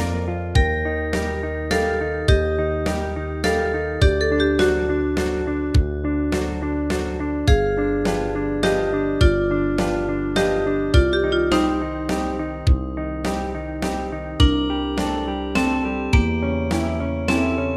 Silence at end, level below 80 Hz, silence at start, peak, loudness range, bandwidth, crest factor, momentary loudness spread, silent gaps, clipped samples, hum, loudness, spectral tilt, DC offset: 0 s; -26 dBFS; 0 s; -2 dBFS; 3 LU; 13.5 kHz; 18 dB; 7 LU; none; under 0.1%; none; -21 LUFS; -6 dB/octave; under 0.1%